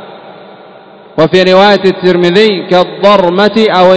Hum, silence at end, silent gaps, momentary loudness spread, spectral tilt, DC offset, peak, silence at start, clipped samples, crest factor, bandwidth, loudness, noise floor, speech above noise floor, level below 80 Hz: none; 0 s; none; 5 LU; -6 dB/octave; under 0.1%; 0 dBFS; 0 s; 4%; 8 dB; 8 kHz; -7 LUFS; -34 dBFS; 28 dB; -48 dBFS